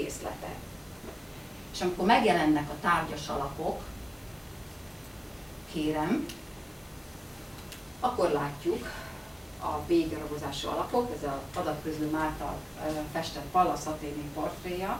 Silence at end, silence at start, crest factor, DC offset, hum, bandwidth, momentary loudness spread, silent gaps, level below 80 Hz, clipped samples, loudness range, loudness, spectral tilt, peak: 0 s; 0 s; 22 dB; under 0.1%; none; 16.5 kHz; 17 LU; none; -50 dBFS; under 0.1%; 8 LU; -31 LUFS; -5 dB/octave; -10 dBFS